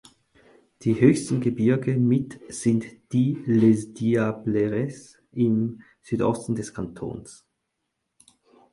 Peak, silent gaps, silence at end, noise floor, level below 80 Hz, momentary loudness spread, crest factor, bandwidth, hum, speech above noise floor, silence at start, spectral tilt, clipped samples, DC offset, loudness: -4 dBFS; none; 1.4 s; -79 dBFS; -58 dBFS; 15 LU; 20 dB; 11.5 kHz; none; 56 dB; 0.8 s; -7.5 dB/octave; under 0.1%; under 0.1%; -24 LUFS